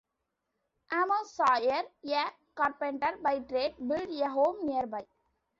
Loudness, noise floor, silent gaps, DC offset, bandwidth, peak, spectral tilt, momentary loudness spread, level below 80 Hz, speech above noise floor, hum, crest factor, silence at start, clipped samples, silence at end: -31 LUFS; -84 dBFS; none; under 0.1%; 7.8 kHz; -14 dBFS; -4 dB/octave; 7 LU; -70 dBFS; 54 dB; none; 18 dB; 0.9 s; under 0.1%; 0.55 s